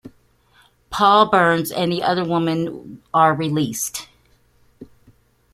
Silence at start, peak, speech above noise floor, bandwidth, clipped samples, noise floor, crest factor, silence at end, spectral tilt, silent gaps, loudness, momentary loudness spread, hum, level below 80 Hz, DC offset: 0.05 s; -2 dBFS; 39 dB; 16 kHz; under 0.1%; -57 dBFS; 18 dB; 0.7 s; -4.5 dB/octave; none; -18 LUFS; 14 LU; none; -56 dBFS; under 0.1%